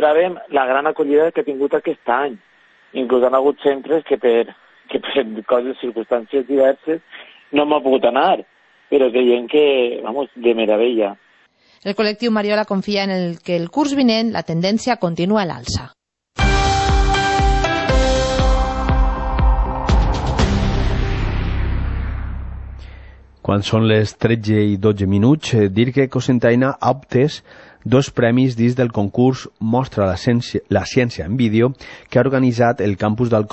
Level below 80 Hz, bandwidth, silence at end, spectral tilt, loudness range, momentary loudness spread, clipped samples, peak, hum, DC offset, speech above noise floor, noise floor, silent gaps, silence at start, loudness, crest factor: -26 dBFS; 8.4 kHz; 0.05 s; -6.5 dB/octave; 3 LU; 9 LU; under 0.1%; -2 dBFS; none; under 0.1%; 38 dB; -54 dBFS; none; 0 s; -18 LUFS; 16 dB